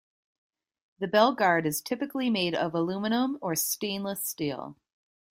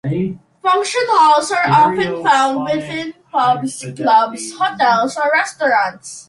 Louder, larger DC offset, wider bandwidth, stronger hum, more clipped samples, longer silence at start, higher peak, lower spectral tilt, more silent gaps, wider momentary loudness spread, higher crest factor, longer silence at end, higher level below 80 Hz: second, -28 LUFS vs -15 LUFS; neither; first, 16 kHz vs 11.5 kHz; neither; neither; first, 1 s vs 0.05 s; second, -8 dBFS vs 0 dBFS; about the same, -3.5 dB/octave vs -4 dB/octave; neither; about the same, 10 LU vs 10 LU; first, 22 dB vs 14 dB; first, 0.6 s vs 0.05 s; second, -70 dBFS vs -58 dBFS